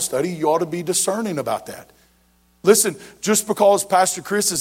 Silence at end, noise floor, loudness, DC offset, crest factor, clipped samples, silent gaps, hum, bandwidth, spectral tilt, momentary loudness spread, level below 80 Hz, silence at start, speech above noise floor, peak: 0 s; -59 dBFS; -19 LUFS; under 0.1%; 20 dB; under 0.1%; none; none; 16.5 kHz; -3 dB/octave; 11 LU; -62 dBFS; 0 s; 39 dB; 0 dBFS